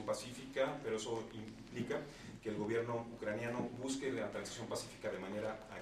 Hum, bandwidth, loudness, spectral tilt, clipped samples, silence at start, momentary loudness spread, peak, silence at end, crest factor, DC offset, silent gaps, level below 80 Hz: none; 14.5 kHz; -42 LUFS; -4.5 dB/octave; under 0.1%; 0 s; 7 LU; -24 dBFS; 0 s; 18 dB; under 0.1%; none; -68 dBFS